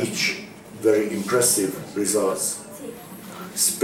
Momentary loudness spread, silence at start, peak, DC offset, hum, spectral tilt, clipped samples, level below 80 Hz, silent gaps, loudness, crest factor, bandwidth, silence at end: 18 LU; 0 s; -6 dBFS; under 0.1%; none; -2.5 dB/octave; under 0.1%; -64 dBFS; none; -22 LUFS; 18 dB; 17.5 kHz; 0 s